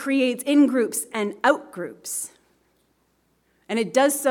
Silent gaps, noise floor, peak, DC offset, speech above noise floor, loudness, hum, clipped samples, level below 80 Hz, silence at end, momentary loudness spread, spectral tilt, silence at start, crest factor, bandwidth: none; -67 dBFS; -4 dBFS; under 0.1%; 45 dB; -22 LUFS; none; under 0.1%; -74 dBFS; 0 s; 12 LU; -3 dB/octave; 0 s; 20 dB; 18 kHz